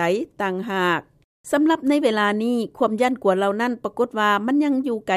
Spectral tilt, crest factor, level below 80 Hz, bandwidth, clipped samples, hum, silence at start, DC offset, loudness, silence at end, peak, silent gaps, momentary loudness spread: -5.5 dB/octave; 16 dB; -64 dBFS; 14 kHz; under 0.1%; none; 0 s; under 0.1%; -21 LUFS; 0 s; -6 dBFS; 1.24-1.44 s; 6 LU